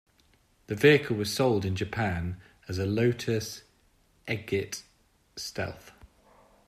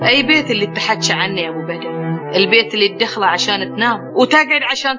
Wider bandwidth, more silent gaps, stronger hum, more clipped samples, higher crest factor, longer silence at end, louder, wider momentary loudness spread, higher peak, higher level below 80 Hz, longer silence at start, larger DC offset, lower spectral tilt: first, 15.5 kHz vs 7.6 kHz; neither; neither; neither; first, 24 dB vs 16 dB; first, 0.75 s vs 0 s; second, -28 LUFS vs -14 LUFS; first, 19 LU vs 10 LU; second, -6 dBFS vs 0 dBFS; first, -58 dBFS vs -68 dBFS; first, 0.7 s vs 0 s; neither; first, -5.5 dB/octave vs -3.5 dB/octave